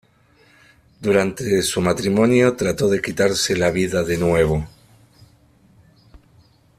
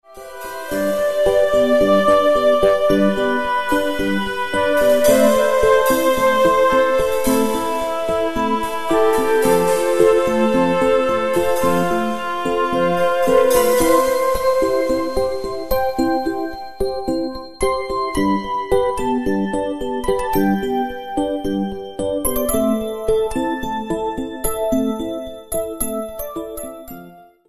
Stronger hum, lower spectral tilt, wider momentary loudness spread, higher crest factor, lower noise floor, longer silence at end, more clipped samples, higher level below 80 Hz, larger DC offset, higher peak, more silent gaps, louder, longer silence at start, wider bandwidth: neither; about the same, -5 dB/octave vs -4.5 dB/octave; second, 5 LU vs 11 LU; about the same, 18 dB vs 16 dB; first, -55 dBFS vs -41 dBFS; first, 0.6 s vs 0 s; neither; second, -44 dBFS vs -38 dBFS; second, under 0.1% vs 2%; about the same, -2 dBFS vs -2 dBFS; neither; about the same, -19 LUFS vs -18 LUFS; first, 1 s vs 0 s; first, 15.5 kHz vs 14 kHz